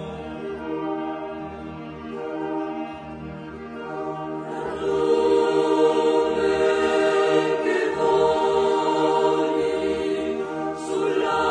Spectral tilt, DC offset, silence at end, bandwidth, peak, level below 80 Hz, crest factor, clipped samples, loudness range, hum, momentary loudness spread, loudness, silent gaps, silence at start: -5 dB/octave; under 0.1%; 0 s; 10 kHz; -8 dBFS; -54 dBFS; 16 dB; under 0.1%; 11 LU; none; 15 LU; -23 LUFS; none; 0 s